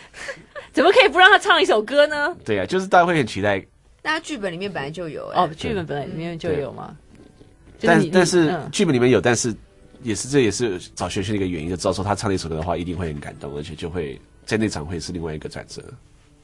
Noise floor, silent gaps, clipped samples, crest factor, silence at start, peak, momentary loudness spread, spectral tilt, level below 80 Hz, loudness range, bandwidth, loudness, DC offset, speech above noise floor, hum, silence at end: -48 dBFS; none; under 0.1%; 20 dB; 0 s; 0 dBFS; 17 LU; -4.5 dB/octave; -48 dBFS; 10 LU; 11.5 kHz; -20 LUFS; under 0.1%; 28 dB; none; 0.45 s